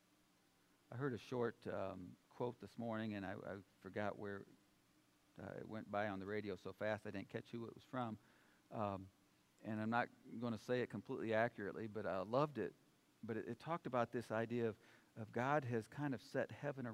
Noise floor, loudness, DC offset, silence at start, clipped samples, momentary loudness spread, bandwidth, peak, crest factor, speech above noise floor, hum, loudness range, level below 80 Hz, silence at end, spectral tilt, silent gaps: -76 dBFS; -45 LUFS; under 0.1%; 0.9 s; under 0.1%; 14 LU; 15.5 kHz; -24 dBFS; 22 dB; 31 dB; none; 5 LU; -84 dBFS; 0 s; -7 dB/octave; none